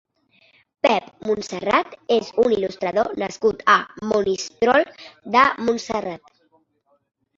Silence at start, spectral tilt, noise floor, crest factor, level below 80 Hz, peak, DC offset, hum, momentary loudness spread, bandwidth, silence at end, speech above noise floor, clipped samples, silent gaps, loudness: 0.85 s; -4 dB/octave; -66 dBFS; 20 dB; -58 dBFS; -2 dBFS; under 0.1%; none; 9 LU; 7.8 kHz; 1.2 s; 45 dB; under 0.1%; none; -21 LUFS